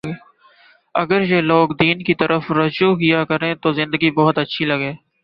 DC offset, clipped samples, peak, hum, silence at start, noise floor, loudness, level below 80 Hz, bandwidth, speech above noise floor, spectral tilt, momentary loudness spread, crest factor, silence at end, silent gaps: under 0.1%; under 0.1%; -2 dBFS; none; 0.05 s; -52 dBFS; -17 LUFS; -56 dBFS; 5.8 kHz; 35 dB; -8.5 dB/octave; 8 LU; 16 dB; 0.3 s; none